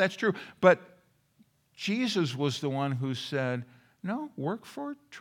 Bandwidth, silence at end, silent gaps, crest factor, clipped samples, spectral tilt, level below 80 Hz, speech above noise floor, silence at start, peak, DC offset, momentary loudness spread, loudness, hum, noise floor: 16 kHz; 0 s; none; 24 dB; under 0.1%; -5.5 dB/octave; -78 dBFS; 37 dB; 0 s; -6 dBFS; under 0.1%; 16 LU; -30 LUFS; none; -66 dBFS